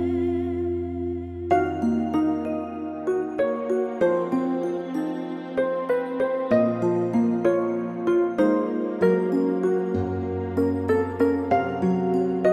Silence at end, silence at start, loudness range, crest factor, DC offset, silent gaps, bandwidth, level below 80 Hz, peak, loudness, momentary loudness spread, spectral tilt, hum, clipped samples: 0 s; 0 s; 3 LU; 16 dB; under 0.1%; none; 9.6 kHz; -54 dBFS; -6 dBFS; -24 LUFS; 7 LU; -8.5 dB/octave; none; under 0.1%